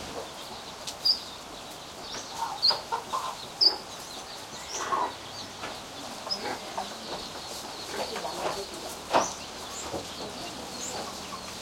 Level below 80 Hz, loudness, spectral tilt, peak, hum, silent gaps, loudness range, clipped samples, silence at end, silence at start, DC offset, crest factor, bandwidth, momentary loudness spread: -60 dBFS; -31 LUFS; -1.5 dB/octave; -10 dBFS; none; none; 6 LU; under 0.1%; 0 s; 0 s; under 0.1%; 24 dB; 16.5 kHz; 15 LU